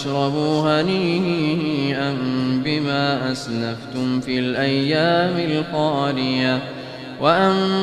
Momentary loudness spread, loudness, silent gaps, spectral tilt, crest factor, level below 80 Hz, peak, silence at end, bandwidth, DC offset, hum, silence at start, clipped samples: 7 LU; -20 LUFS; none; -6.5 dB/octave; 18 dB; -56 dBFS; -2 dBFS; 0 s; 11.5 kHz; under 0.1%; none; 0 s; under 0.1%